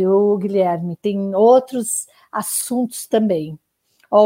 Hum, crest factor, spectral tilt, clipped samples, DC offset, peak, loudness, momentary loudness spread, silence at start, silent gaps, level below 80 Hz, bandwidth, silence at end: none; 16 dB; -5.5 dB/octave; under 0.1%; under 0.1%; -2 dBFS; -18 LUFS; 11 LU; 0 s; none; -66 dBFS; 16 kHz; 0 s